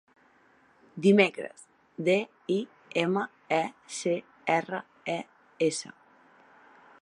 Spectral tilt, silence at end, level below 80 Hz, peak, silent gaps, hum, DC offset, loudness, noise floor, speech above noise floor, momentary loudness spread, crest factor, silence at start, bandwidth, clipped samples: -5 dB/octave; 1.15 s; -82 dBFS; -6 dBFS; none; none; under 0.1%; -29 LUFS; -62 dBFS; 35 dB; 17 LU; 24 dB; 0.95 s; 11 kHz; under 0.1%